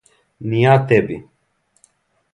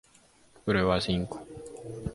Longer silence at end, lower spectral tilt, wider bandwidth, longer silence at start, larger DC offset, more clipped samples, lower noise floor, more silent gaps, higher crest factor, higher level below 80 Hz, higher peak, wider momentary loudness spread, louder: first, 1.15 s vs 0 s; first, -8 dB/octave vs -6 dB/octave; about the same, 10.5 kHz vs 11.5 kHz; second, 0.4 s vs 0.65 s; neither; neither; first, -64 dBFS vs -60 dBFS; neither; about the same, 18 dB vs 20 dB; second, -54 dBFS vs -48 dBFS; first, 0 dBFS vs -12 dBFS; about the same, 18 LU vs 17 LU; first, -16 LUFS vs -29 LUFS